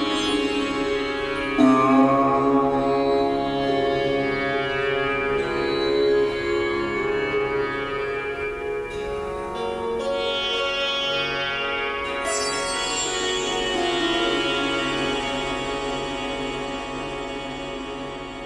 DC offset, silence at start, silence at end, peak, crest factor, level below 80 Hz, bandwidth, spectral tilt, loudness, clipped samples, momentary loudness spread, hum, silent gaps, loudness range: under 0.1%; 0 s; 0 s; -4 dBFS; 18 dB; -46 dBFS; 12 kHz; -3.5 dB/octave; -23 LUFS; under 0.1%; 9 LU; none; none; 6 LU